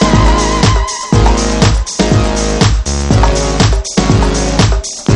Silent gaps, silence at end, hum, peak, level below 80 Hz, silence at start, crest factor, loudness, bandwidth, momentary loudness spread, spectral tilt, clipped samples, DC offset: none; 0 s; none; 0 dBFS; -14 dBFS; 0 s; 10 dB; -11 LUFS; 11 kHz; 3 LU; -5 dB/octave; under 0.1%; under 0.1%